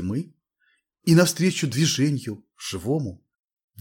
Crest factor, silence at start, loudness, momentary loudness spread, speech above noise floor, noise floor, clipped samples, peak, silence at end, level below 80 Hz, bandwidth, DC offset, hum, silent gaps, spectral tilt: 20 dB; 0 s; -23 LUFS; 16 LU; 46 dB; -69 dBFS; under 0.1%; -4 dBFS; 0.65 s; -60 dBFS; 18 kHz; under 0.1%; none; none; -5 dB/octave